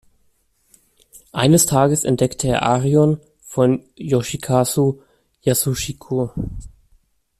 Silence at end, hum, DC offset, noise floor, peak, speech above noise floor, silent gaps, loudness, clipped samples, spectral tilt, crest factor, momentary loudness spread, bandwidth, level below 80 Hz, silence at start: 0.7 s; none; under 0.1%; -62 dBFS; -2 dBFS; 44 dB; none; -18 LUFS; under 0.1%; -5 dB/octave; 18 dB; 13 LU; 14.5 kHz; -44 dBFS; 1.35 s